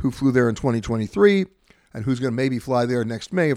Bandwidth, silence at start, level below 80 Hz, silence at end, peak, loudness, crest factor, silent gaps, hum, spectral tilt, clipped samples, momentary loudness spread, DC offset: 13.5 kHz; 0 s; -48 dBFS; 0 s; -4 dBFS; -21 LUFS; 18 dB; none; none; -7 dB/octave; under 0.1%; 9 LU; under 0.1%